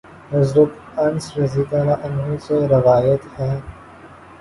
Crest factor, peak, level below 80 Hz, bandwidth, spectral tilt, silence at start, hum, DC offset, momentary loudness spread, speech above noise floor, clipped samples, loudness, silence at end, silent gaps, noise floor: 16 dB; -2 dBFS; -46 dBFS; 11.5 kHz; -8 dB/octave; 0.1 s; none; under 0.1%; 10 LU; 24 dB; under 0.1%; -18 LUFS; 0.35 s; none; -41 dBFS